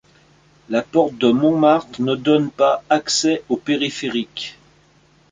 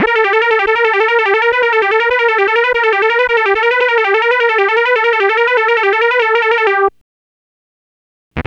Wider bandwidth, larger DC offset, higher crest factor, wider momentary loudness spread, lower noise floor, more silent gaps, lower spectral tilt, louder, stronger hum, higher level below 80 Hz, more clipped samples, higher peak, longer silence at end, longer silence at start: first, 9.4 kHz vs 7.4 kHz; neither; first, 18 dB vs 12 dB; first, 8 LU vs 1 LU; second, -55 dBFS vs under -90 dBFS; second, none vs 7.01-8.31 s; about the same, -4.5 dB/octave vs -4.5 dB/octave; second, -18 LUFS vs -11 LUFS; neither; second, -60 dBFS vs -46 dBFS; neither; about the same, -2 dBFS vs 0 dBFS; first, 0.8 s vs 0.05 s; first, 0.7 s vs 0 s